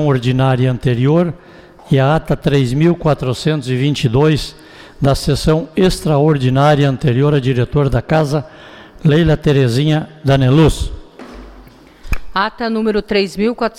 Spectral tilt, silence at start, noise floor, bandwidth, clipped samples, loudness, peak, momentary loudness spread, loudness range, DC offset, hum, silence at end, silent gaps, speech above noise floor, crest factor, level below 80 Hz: -7 dB/octave; 0 s; -40 dBFS; 14.5 kHz; under 0.1%; -14 LUFS; -2 dBFS; 9 LU; 3 LU; under 0.1%; none; 0.1 s; none; 27 dB; 12 dB; -30 dBFS